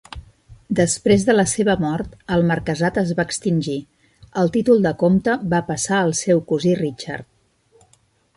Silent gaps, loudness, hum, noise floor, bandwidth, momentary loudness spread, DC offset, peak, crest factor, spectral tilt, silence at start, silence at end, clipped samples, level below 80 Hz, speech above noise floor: none; -19 LUFS; none; -59 dBFS; 11.5 kHz; 12 LU; under 0.1%; -4 dBFS; 16 dB; -5.5 dB/octave; 0.15 s; 1.15 s; under 0.1%; -48 dBFS; 41 dB